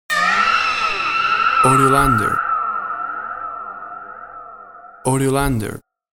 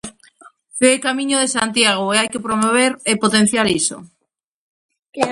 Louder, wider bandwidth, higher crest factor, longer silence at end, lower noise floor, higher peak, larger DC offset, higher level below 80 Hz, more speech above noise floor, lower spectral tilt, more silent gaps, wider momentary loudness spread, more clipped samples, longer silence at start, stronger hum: about the same, -17 LUFS vs -16 LUFS; first, 16.5 kHz vs 11.5 kHz; about the same, 18 dB vs 18 dB; first, 0.35 s vs 0 s; second, -40 dBFS vs -74 dBFS; about the same, 0 dBFS vs 0 dBFS; neither; first, -38 dBFS vs -56 dBFS; second, 24 dB vs 58 dB; first, -4.5 dB/octave vs -2.5 dB/octave; second, none vs 4.44-4.89 s; first, 21 LU vs 10 LU; neither; about the same, 0.1 s vs 0.05 s; neither